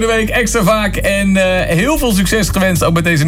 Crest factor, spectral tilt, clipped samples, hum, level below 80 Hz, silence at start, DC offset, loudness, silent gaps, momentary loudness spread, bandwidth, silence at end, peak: 10 dB; -4.5 dB/octave; under 0.1%; none; -24 dBFS; 0 s; under 0.1%; -13 LUFS; none; 1 LU; 16.5 kHz; 0 s; -2 dBFS